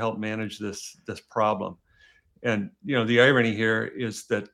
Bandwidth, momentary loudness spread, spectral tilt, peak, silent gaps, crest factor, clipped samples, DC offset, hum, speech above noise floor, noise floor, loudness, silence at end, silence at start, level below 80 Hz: 15 kHz; 16 LU; -5 dB/octave; -6 dBFS; none; 20 dB; under 0.1%; under 0.1%; none; 34 dB; -60 dBFS; -25 LUFS; 0.1 s; 0 s; -70 dBFS